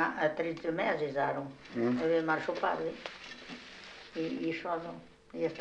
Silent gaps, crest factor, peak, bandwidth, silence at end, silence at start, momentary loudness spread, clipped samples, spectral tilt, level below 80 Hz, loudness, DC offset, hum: none; 18 dB; -16 dBFS; 9 kHz; 0 s; 0 s; 16 LU; under 0.1%; -6 dB/octave; -70 dBFS; -34 LUFS; under 0.1%; none